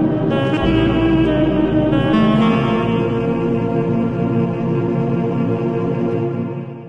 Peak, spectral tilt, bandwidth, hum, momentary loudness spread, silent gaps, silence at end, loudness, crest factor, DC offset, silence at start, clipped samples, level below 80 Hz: -4 dBFS; -9 dB/octave; 7.8 kHz; none; 5 LU; none; 0 s; -17 LUFS; 14 dB; under 0.1%; 0 s; under 0.1%; -34 dBFS